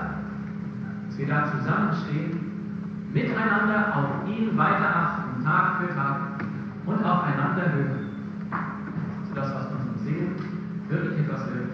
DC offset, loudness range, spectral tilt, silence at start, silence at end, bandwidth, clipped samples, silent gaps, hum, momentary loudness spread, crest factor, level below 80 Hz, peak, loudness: under 0.1%; 6 LU; -9 dB/octave; 0 s; 0 s; 6.4 kHz; under 0.1%; none; none; 11 LU; 18 dB; -58 dBFS; -8 dBFS; -27 LUFS